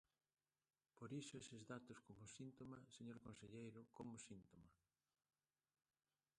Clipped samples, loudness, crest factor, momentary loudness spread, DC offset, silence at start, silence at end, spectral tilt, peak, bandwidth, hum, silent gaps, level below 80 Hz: under 0.1%; -59 LUFS; 20 dB; 8 LU; under 0.1%; 0.95 s; 1.65 s; -5 dB/octave; -42 dBFS; 11 kHz; none; none; -84 dBFS